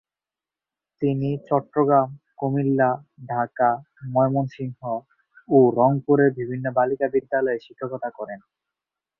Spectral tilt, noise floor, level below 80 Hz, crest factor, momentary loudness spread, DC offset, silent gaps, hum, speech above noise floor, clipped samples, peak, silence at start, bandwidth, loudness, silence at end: -11 dB/octave; under -90 dBFS; -64 dBFS; 18 dB; 13 LU; under 0.1%; none; none; over 68 dB; under 0.1%; -4 dBFS; 1 s; 5.8 kHz; -23 LUFS; 0.8 s